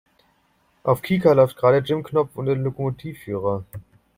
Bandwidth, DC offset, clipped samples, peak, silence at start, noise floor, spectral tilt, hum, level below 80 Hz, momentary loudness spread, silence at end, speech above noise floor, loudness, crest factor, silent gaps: 16 kHz; under 0.1%; under 0.1%; -2 dBFS; 0.85 s; -64 dBFS; -8 dB/octave; none; -56 dBFS; 14 LU; 0.35 s; 43 dB; -21 LUFS; 20 dB; none